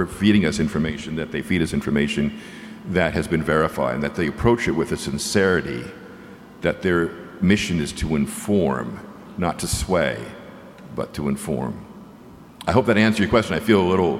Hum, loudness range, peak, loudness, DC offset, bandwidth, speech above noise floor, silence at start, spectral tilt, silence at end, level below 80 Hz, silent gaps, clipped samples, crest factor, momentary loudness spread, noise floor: none; 4 LU; -2 dBFS; -22 LUFS; under 0.1%; 15.5 kHz; 23 dB; 0 s; -5.5 dB/octave; 0 s; -40 dBFS; none; under 0.1%; 20 dB; 19 LU; -44 dBFS